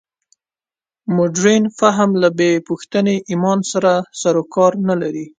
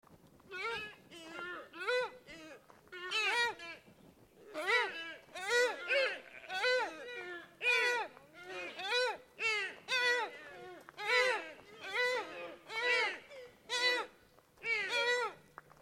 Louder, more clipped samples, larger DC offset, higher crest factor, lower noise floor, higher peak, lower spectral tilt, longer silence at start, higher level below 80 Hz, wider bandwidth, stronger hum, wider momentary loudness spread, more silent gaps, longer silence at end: first, -16 LUFS vs -35 LUFS; neither; neither; about the same, 16 dB vs 20 dB; first, under -90 dBFS vs -65 dBFS; first, 0 dBFS vs -18 dBFS; first, -5.5 dB/octave vs -0.5 dB/octave; first, 1.1 s vs 0.1 s; first, -62 dBFS vs -78 dBFS; second, 9.4 kHz vs 16.5 kHz; neither; second, 6 LU vs 19 LU; neither; second, 0.1 s vs 0.45 s